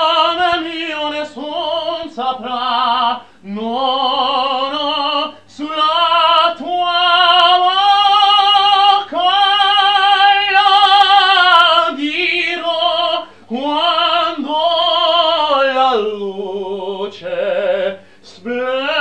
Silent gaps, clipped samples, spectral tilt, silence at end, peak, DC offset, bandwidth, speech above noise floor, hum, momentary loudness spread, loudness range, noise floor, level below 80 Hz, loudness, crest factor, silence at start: none; under 0.1%; -2.5 dB/octave; 0 s; 0 dBFS; 0.4%; 9.4 kHz; 23 dB; none; 14 LU; 8 LU; -41 dBFS; -62 dBFS; -13 LUFS; 14 dB; 0 s